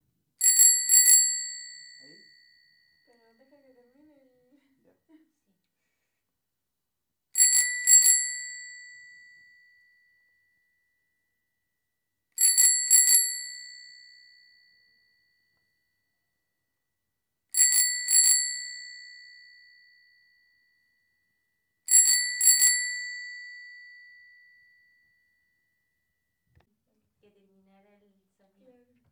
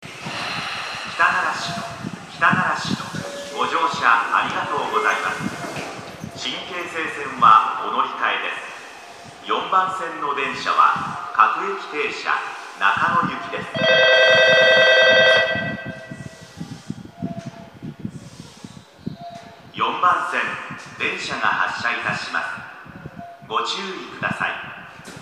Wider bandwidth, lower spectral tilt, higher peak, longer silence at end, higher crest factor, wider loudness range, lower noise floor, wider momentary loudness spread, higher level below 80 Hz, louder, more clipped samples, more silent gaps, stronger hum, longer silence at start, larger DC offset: first, 19 kHz vs 14.5 kHz; second, 6 dB/octave vs -3.5 dB/octave; second, -4 dBFS vs 0 dBFS; first, 5.45 s vs 0 s; about the same, 24 dB vs 22 dB; about the same, 9 LU vs 11 LU; first, -85 dBFS vs -41 dBFS; about the same, 25 LU vs 23 LU; second, under -90 dBFS vs -60 dBFS; about the same, -19 LUFS vs -19 LUFS; neither; neither; neither; first, 0.4 s vs 0 s; neither